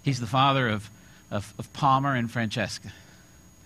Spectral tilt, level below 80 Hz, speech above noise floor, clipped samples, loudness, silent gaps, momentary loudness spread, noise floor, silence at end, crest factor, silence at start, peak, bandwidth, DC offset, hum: -5.5 dB/octave; -58 dBFS; 27 dB; under 0.1%; -26 LUFS; none; 16 LU; -53 dBFS; 0.65 s; 18 dB; 0.05 s; -8 dBFS; 14 kHz; under 0.1%; none